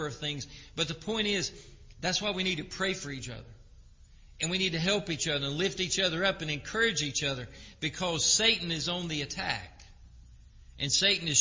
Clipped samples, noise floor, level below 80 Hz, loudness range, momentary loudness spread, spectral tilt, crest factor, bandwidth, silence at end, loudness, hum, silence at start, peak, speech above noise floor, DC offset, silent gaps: under 0.1%; -54 dBFS; -54 dBFS; 5 LU; 12 LU; -2.5 dB/octave; 22 dB; 7.8 kHz; 0 s; -29 LUFS; none; 0 s; -10 dBFS; 23 dB; under 0.1%; none